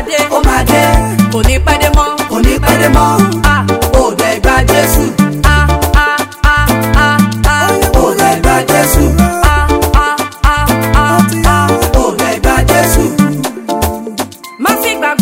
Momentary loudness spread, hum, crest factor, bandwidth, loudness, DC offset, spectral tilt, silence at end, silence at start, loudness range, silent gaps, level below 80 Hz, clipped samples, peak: 4 LU; none; 10 dB; 17 kHz; -10 LUFS; 0.3%; -5 dB/octave; 0 s; 0 s; 1 LU; none; -14 dBFS; 2%; 0 dBFS